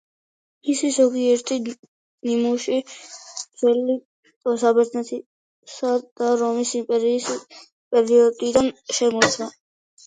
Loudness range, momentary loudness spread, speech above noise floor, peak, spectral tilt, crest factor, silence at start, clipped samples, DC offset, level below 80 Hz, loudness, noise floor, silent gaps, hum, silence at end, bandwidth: 3 LU; 15 LU; over 70 dB; 0 dBFS; -3 dB/octave; 22 dB; 0.65 s; under 0.1%; under 0.1%; -62 dBFS; -21 LUFS; under -90 dBFS; 1.79-2.18 s, 4.05-4.23 s, 4.36-4.41 s, 5.26-5.63 s, 6.11-6.16 s, 7.72-7.91 s; none; 0.55 s; 9.4 kHz